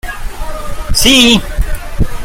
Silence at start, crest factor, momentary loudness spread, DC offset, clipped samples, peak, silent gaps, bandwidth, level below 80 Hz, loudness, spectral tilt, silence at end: 0.05 s; 12 dB; 19 LU; under 0.1%; 0.1%; 0 dBFS; none; 17 kHz; -18 dBFS; -9 LUFS; -3 dB/octave; 0 s